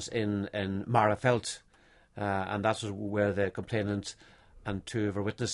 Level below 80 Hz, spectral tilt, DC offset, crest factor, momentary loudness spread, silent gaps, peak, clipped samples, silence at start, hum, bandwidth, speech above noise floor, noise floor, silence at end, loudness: -56 dBFS; -5.5 dB/octave; under 0.1%; 22 dB; 12 LU; none; -10 dBFS; under 0.1%; 0 s; none; 11.5 kHz; 31 dB; -62 dBFS; 0 s; -31 LUFS